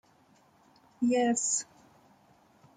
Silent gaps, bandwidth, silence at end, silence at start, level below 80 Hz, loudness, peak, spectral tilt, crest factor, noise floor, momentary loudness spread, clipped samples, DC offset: none; 9.6 kHz; 1.15 s; 1 s; -76 dBFS; -28 LUFS; -16 dBFS; -2.5 dB/octave; 16 dB; -64 dBFS; 8 LU; under 0.1%; under 0.1%